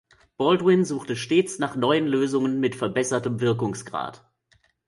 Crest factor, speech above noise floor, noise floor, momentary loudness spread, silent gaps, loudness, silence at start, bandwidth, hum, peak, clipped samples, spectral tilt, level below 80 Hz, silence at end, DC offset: 18 dB; 41 dB; -64 dBFS; 9 LU; none; -24 LUFS; 0.4 s; 11.5 kHz; none; -6 dBFS; under 0.1%; -5.5 dB/octave; -64 dBFS; 0.7 s; under 0.1%